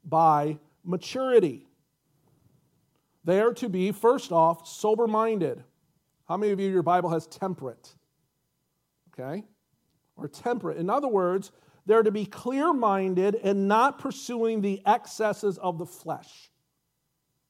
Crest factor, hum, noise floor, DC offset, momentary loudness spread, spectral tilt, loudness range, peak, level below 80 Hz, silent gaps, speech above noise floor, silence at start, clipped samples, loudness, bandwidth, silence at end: 18 dB; none; -78 dBFS; under 0.1%; 15 LU; -6.5 dB/octave; 7 LU; -8 dBFS; -78 dBFS; none; 52 dB; 0.05 s; under 0.1%; -26 LUFS; 16 kHz; 1.3 s